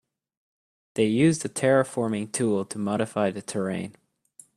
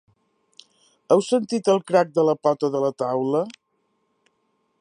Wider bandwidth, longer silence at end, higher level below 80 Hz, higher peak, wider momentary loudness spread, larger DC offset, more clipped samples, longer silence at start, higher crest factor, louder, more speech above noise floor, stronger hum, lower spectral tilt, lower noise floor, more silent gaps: first, 13.5 kHz vs 11 kHz; second, 0.65 s vs 1.3 s; first, -66 dBFS vs -78 dBFS; second, -8 dBFS vs -4 dBFS; first, 9 LU vs 5 LU; neither; neither; second, 0.95 s vs 1.1 s; about the same, 18 dB vs 20 dB; second, -25 LUFS vs -21 LUFS; second, 31 dB vs 50 dB; neither; about the same, -5.5 dB/octave vs -6 dB/octave; second, -55 dBFS vs -71 dBFS; neither